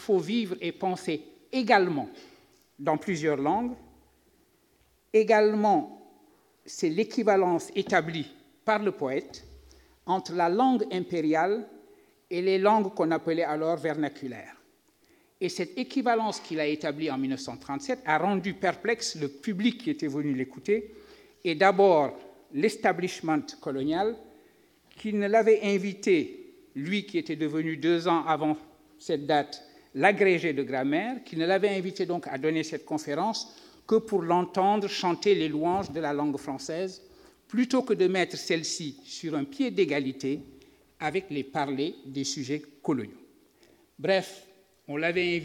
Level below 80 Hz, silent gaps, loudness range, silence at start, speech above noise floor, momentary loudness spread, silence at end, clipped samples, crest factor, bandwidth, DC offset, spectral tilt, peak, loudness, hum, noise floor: -68 dBFS; none; 5 LU; 0 s; 39 dB; 12 LU; 0 s; under 0.1%; 22 dB; 15 kHz; under 0.1%; -5 dB/octave; -6 dBFS; -28 LUFS; none; -66 dBFS